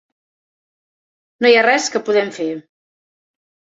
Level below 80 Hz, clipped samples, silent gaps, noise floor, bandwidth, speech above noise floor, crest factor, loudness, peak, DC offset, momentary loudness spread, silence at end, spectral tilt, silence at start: -70 dBFS; under 0.1%; none; under -90 dBFS; 7.8 kHz; over 75 dB; 18 dB; -15 LUFS; -2 dBFS; under 0.1%; 13 LU; 1.1 s; -2.5 dB/octave; 1.4 s